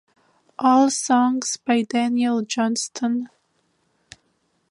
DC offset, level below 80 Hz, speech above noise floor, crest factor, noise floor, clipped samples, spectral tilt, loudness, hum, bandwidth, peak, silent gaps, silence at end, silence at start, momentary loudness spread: under 0.1%; -72 dBFS; 48 dB; 18 dB; -68 dBFS; under 0.1%; -3 dB/octave; -21 LUFS; none; 11.5 kHz; -4 dBFS; none; 1.45 s; 0.6 s; 8 LU